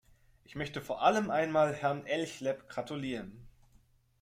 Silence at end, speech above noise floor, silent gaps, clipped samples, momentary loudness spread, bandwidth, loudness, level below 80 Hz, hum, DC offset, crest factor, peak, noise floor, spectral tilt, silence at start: 0.7 s; 33 dB; none; under 0.1%; 12 LU; 15.5 kHz; -33 LUFS; -64 dBFS; none; under 0.1%; 22 dB; -12 dBFS; -66 dBFS; -5.5 dB/octave; 0.5 s